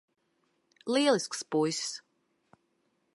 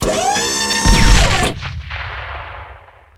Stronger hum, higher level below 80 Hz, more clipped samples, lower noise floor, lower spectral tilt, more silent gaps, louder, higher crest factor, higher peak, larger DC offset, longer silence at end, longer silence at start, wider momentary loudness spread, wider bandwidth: neither; second, -84 dBFS vs -20 dBFS; neither; first, -75 dBFS vs -40 dBFS; about the same, -3.5 dB/octave vs -3 dB/octave; neither; second, -29 LUFS vs -15 LUFS; first, 22 dB vs 16 dB; second, -12 dBFS vs 0 dBFS; neither; first, 1.15 s vs 0.4 s; first, 0.85 s vs 0 s; about the same, 15 LU vs 17 LU; second, 11.5 kHz vs 16 kHz